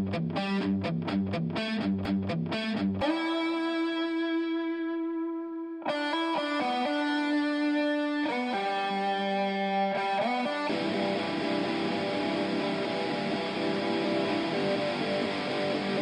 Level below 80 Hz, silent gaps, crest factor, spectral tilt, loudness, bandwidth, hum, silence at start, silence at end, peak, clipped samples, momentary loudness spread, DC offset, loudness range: -66 dBFS; none; 12 dB; -6 dB/octave; -30 LUFS; 10 kHz; none; 0 s; 0 s; -16 dBFS; under 0.1%; 3 LU; under 0.1%; 2 LU